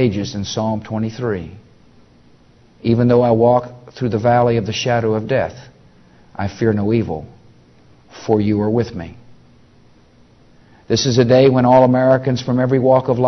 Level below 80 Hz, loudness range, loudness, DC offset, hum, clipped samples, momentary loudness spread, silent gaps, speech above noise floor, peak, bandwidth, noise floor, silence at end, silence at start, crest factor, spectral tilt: -48 dBFS; 7 LU; -16 LUFS; under 0.1%; none; under 0.1%; 15 LU; none; 34 dB; 0 dBFS; 6.4 kHz; -49 dBFS; 0 s; 0 s; 16 dB; -6.5 dB/octave